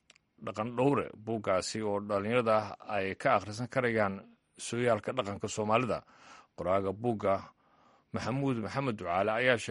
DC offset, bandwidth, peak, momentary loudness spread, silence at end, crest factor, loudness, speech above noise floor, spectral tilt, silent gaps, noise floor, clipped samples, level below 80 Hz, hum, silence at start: under 0.1%; 11.5 kHz; -12 dBFS; 9 LU; 0 s; 20 dB; -32 LUFS; 34 dB; -5.5 dB/octave; none; -65 dBFS; under 0.1%; -66 dBFS; none; 0.4 s